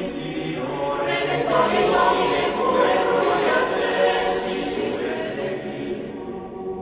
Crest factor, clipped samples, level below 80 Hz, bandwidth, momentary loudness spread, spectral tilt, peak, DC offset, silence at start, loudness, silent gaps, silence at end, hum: 16 dB; under 0.1%; -50 dBFS; 4 kHz; 11 LU; -9 dB/octave; -6 dBFS; under 0.1%; 0 s; -22 LUFS; none; 0 s; none